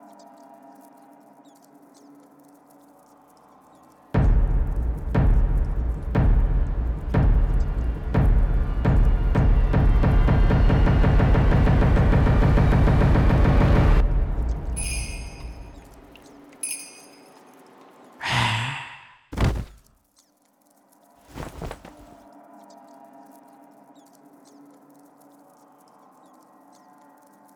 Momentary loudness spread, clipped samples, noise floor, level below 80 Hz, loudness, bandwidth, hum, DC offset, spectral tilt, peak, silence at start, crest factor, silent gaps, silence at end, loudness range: 19 LU; under 0.1%; -63 dBFS; -24 dBFS; -22 LUFS; 16.5 kHz; none; under 0.1%; -6.5 dB/octave; -8 dBFS; 4.15 s; 14 dB; none; 5.65 s; 20 LU